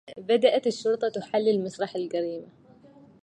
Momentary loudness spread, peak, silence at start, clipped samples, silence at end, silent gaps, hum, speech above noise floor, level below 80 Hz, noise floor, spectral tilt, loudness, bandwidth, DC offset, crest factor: 9 LU; -8 dBFS; 0.05 s; under 0.1%; 0.75 s; none; none; 27 dB; -76 dBFS; -53 dBFS; -5 dB/octave; -26 LUFS; 9.8 kHz; under 0.1%; 18 dB